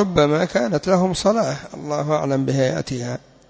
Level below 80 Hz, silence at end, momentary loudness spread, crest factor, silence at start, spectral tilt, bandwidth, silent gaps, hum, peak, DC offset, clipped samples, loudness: -48 dBFS; 0.3 s; 9 LU; 16 dB; 0 s; -6 dB/octave; 8 kHz; none; none; -4 dBFS; under 0.1%; under 0.1%; -20 LUFS